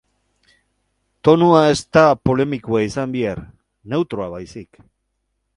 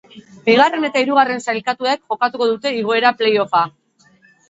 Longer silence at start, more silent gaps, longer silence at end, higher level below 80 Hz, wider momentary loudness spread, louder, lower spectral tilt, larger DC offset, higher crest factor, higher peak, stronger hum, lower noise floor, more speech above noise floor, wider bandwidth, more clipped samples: first, 1.25 s vs 0.15 s; neither; first, 0.95 s vs 0.8 s; first, -48 dBFS vs -68 dBFS; first, 19 LU vs 7 LU; about the same, -17 LUFS vs -17 LUFS; first, -6.5 dB/octave vs -4 dB/octave; neither; about the same, 18 dB vs 18 dB; about the same, 0 dBFS vs 0 dBFS; first, 50 Hz at -50 dBFS vs none; first, -72 dBFS vs -54 dBFS; first, 55 dB vs 38 dB; first, 11 kHz vs 8 kHz; neither